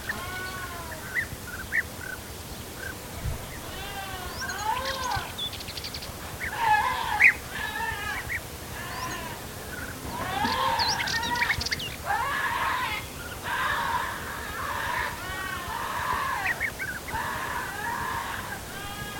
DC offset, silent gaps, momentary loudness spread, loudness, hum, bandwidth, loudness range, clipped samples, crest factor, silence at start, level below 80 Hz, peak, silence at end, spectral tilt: under 0.1%; none; 12 LU; -29 LUFS; none; 17.5 kHz; 7 LU; under 0.1%; 24 dB; 0 s; -46 dBFS; -6 dBFS; 0 s; -2.5 dB/octave